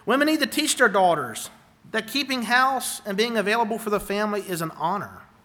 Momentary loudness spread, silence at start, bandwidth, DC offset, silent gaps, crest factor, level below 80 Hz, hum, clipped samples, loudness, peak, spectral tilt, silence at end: 11 LU; 0.05 s; over 20 kHz; under 0.1%; none; 18 dB; -60 dBFS; none; under 0.1%; -23 LUFS; -6 dBFS; -3 dB/octave; 0.2 s